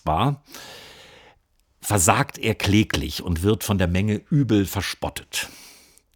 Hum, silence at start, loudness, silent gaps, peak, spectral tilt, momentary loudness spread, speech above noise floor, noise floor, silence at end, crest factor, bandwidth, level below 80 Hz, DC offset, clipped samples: none; 0.05 s; -22 LUFS; none; 0 dBFS; -4.5 dB/octave; 15 LU; 41 dB; -63 dBFS; 0.45 s; 22 dB; over 20 kHz; -44 dBFS; under 0.1%; under 0.1%